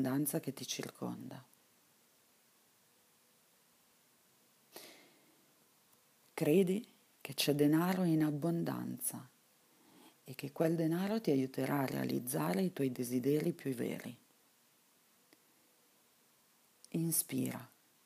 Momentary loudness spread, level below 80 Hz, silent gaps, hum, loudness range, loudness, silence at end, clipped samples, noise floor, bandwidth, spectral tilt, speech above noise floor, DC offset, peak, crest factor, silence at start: 20 LU; -84 dBFS; none; none; 14 LU; -36 LUFS; 0.4 s; under 0.1%; -70 dBFS; 15.5 kHz; -5.5 dB/octave; 35 dB; under 0.1%; -18 dBFS; 20 dB; 0 s